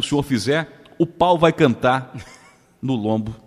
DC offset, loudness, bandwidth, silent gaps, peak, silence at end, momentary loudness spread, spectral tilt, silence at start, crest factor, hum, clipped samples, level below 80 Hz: under 0.1%; -19 LUFS; 15 kHz; none; 0 dBFS; 0.1 s; 16 LU; -6 dB/octave; 0 s; 20 dB; none; under 0.1%; -50 dBFS